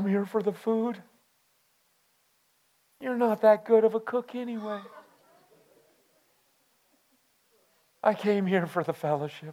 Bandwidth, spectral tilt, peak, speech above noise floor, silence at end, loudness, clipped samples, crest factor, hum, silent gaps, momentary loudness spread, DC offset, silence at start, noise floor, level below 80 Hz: 15.5 kHz; -7.5 dB/octave; -10 dBFS; 43 dB; 0 s; -27 LUFS; under 0.1%; 20 dB; none; none; 14 LU; under 0.1%; 0 s; -69 dBFS; -84 dBFS